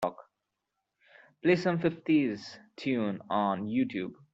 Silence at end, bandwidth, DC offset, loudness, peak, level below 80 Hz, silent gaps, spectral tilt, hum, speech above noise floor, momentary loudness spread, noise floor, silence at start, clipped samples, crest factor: 0.2 s; 8 kHz; under 0.1%; -30 LUFS; -12 dBFS; -72 dBFS; none; -7 dB/octave; none; 55 dB; 11 LU; -85 dBFS; 0 s; under 0.1%; 20 dB